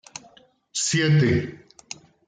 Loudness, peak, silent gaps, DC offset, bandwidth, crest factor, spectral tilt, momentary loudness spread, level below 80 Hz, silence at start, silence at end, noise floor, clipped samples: -21 LUFS; -10 dBFS; none; under 0.1%; 9.6 kHz; 16 dB; -4.5 dB/octave; 22 LU; -54 dBFS; 0.75 s; 0.7 s; -55 dBFS; under 0.1%